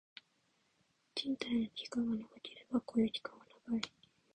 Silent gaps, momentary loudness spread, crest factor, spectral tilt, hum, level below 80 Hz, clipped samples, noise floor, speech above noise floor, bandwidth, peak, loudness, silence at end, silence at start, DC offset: none; 16 LU; 20 dB; -5 dB/octave; none; -74 dBFS; under 0.1%; -77 dBFS; 39 dB; 9.6 kHz; -20 dBFS; -39 LUFS; 0.45 s; 1.15 s; under 0.1%